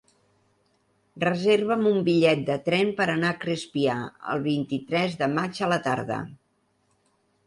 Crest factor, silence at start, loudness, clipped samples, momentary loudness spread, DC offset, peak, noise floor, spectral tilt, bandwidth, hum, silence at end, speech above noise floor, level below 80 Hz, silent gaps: 18 dB; 1.15 s; -25 LUFS; under 0.1%; 8 LU; under 0.1%; -8 dBFS; -70 dBFS; -6 dB/octave; 11.5 kHz; none; 1.1 s; 45 dB; -66 dBFS; none